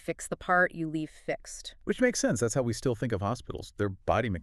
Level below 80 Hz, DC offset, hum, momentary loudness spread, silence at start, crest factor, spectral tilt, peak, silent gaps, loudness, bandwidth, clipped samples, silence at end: -52 dBFS; under 0.1%; none; 11 LU; 0.05 s; 18 dB; -5 dB/octave; -12 dBFS; none; -30 LUFS; 13.5 kHz; under 0.1%; 0 s